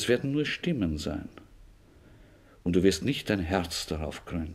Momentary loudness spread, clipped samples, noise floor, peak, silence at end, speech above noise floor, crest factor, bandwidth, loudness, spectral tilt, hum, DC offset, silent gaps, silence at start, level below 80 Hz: 11 LU; under 0.1%; -55 dBFS; -10 dBFS; 0 s; 27 dB; 20 dB; 16 kHz; -29 LUFS; -5 dB/octave; none; under 0.1%; none; 0 s; -46 dBFS